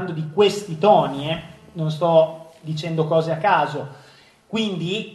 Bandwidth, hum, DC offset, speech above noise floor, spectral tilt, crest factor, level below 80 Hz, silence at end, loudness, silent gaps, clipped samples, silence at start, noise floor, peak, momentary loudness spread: 12.5 kHz; none; under 0.1%; 31 dB; -6 dB/octave; 18 dB; -60 dBFS; 0 s; -21 LUFS; none; under 0.1%; 0 s; -50 dBFS; -2 dBFS; 14 LU